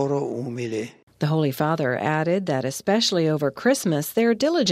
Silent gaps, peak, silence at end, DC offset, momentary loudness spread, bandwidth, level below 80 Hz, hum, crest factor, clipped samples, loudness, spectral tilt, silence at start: 1.03-1.07 s; -8 dBFS; 0 s; under 0.1%; 8 LU; 16 kHz; -66 dBFS; none; 16 dB; under 0.1%; -23 LUFS; -5 dB/octave; 0 s